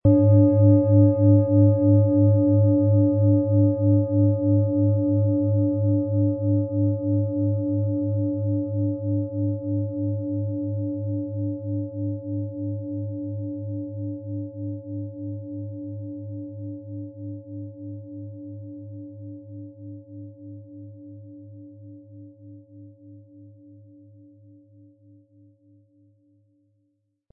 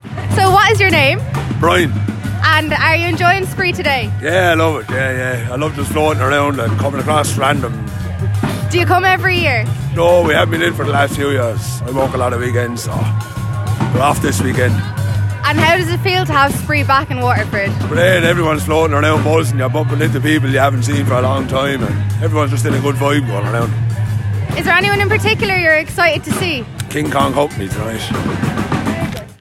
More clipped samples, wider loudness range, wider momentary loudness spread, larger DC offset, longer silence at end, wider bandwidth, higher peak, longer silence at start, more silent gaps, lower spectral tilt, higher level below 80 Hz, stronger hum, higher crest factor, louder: neither; first, 22 LU vs 3 LU; first, 23 LU vs 7 LU; neither; first, 3.85 s vs 0.05 s; second, 1.3 kHz vs 15.5 kHz; second, -6 dBFS vs 0 dBFS; about the same, 0.05 s vs 0.05 s; neither; first, -17 dB/octave vs -5.5 dB/octave; second, -58 dBFS vs -38 dBFS; neither; about the same, 18 dB vs 14 dB; second, -22 LUFS vs -14 LUFS